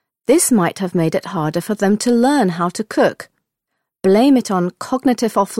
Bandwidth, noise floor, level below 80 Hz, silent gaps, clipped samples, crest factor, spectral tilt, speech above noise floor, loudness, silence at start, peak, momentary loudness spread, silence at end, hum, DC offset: 16.5 kHz; -77 dBFS; -58 dBFS; none; under 0.1%; 14 dB; -5 dB/octave; 61 dB; -16 LUFS; 0.3 s; -2 dBFS; 8 LU; 0 s; none; under 0.1%